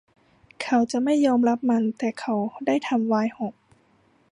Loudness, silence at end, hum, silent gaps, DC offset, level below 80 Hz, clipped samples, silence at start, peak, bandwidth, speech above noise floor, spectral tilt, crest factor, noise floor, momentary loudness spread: -24 LUFS; 0.8 s; none; none; under 0.1%; -70 dBFS; under 0.1%; 0.6 s; -8 dBFS; 10.5 kHz; 39 dB; -5.5 dB/octave; 16 dB; -62 dBFS; 8 LU